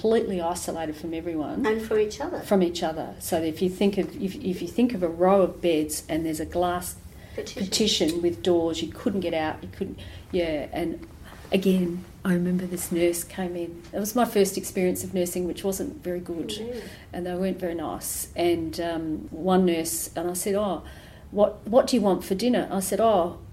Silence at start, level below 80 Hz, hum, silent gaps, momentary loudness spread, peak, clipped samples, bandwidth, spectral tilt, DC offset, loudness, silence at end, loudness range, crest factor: 0 s; -50 dBFS; none; none; 11 LU; -8 dBFS; under 0.1%; 16 kHz; -5 dB/octave; under 0.1%; -26 LUFS; 0 s; 4 LU; 18 dB